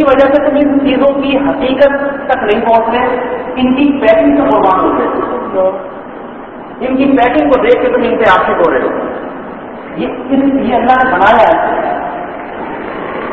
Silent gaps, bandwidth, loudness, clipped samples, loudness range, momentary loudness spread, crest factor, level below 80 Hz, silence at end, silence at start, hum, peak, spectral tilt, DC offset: none; 5.8 kHz; -11 LUFS; 0.3%; 2 LU; 15 LU; 10 dB; -40 dBFS; 0 s; 0 s; none; 0 dBFS; -7.5 dB/octave; 0.2%